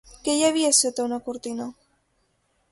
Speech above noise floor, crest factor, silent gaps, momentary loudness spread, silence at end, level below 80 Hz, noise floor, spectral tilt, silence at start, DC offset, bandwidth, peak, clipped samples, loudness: 46 dB; 20 dB; none; 15 LU; 1 s; -62 dBFS; -69 dBFS; -1 dB/octave; 0.25 s; under 0.1%; 12 kHz; -6 dBFS; under 0.1%; -22 LUFS